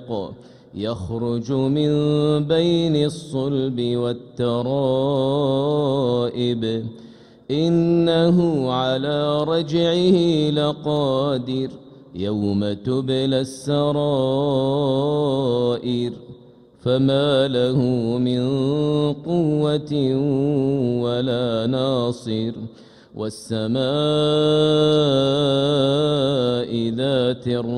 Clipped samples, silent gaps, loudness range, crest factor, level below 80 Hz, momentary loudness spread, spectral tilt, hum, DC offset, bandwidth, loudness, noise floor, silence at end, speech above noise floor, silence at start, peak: under 0.1%; none; 4 LU; 14 dB; -54 dBFS; 9 LU; -7.5 dB/octave; none; under 0.1%; 11 kHz; -20 LUFS; -47 dBFS; 0 s; 28 dB; 0 s; -6 dBFS